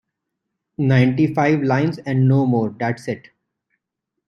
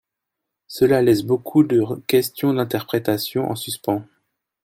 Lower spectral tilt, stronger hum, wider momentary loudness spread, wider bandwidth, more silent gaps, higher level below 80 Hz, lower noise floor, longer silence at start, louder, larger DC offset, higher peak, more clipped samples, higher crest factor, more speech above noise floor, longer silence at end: first, -8.5 dB/octave vs -6 dB/octave; neither; first, 12 LU vs 8 LU; second, 6.6 kHz vs 16.5 kHz; neither; about the same, -58 dBFS vs -58 dBFS; about the same, -80 dBFS vs -82 dBFS; about the same, 0.8 s vs 0.7 s; about the same, -18 LUFS vs -20 LUFS; neither; about the same, -2 dBFS vs -4 dBFS; neither; about the same, 18 dB vs 16 dB; about the same, 63 dB vs 63 dB; first, 1.1 s vs 0.6 s